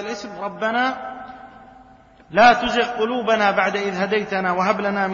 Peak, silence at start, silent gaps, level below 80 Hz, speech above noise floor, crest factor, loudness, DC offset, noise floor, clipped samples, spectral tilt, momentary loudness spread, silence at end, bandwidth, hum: -2 dBFS; 0 s; none; -54 dBFS; 29 dB; 20 dB; -19 LUFS; under 0.1%; -48 dBFS; under 0.1%; -4.5 dB/octave; 16 LU; 0 s; 7.4 kHz; none